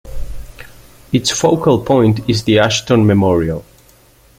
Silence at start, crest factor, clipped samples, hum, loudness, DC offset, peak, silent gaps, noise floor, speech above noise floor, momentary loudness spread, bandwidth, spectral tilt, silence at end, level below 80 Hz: 0.05 s; 14 dB; under 0.1%; none; -13 LUFS; under 0.1%; 0 dBFS; none; -47 dBFS; 35 dB; 19 LU; 16 kHz; -5.5 dB/octave; 0.75 s; -34 dBFS